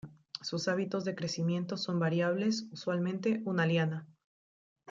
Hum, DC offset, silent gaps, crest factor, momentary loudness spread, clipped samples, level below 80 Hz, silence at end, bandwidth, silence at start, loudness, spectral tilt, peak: none; under 0.1%; none; 16 dB; 6 LU; under 0.1%; -76 dBFS; 0.85 s; 7.6 kHz; 0.05 s; -33 LUFS; -6 dB/octave; -16 dBFS